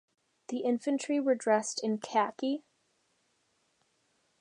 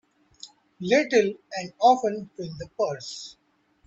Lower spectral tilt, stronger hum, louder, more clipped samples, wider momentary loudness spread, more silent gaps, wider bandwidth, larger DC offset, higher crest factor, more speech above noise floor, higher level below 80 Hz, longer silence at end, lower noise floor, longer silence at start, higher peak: about the same, -4 dB/octave vs -4.5 dB/octave; neither; second, -31 LUFS vs -24 LUFS; neither; second, 7 LU vs 25 LU; neither; first, 11 kHz vs 8.2 kHz; neither; about the same, 20 dB vs 20 dB; first, 44 dB vs 25 dB; second, -88 dBFS vs -64 dBFS; first, 1.8 s vs 0.55 s; first, -75 dBFS vs -50 dBFS; about the same, 0.5 s vs 0.45 s; second, -14 dBFS vs -6 dBFS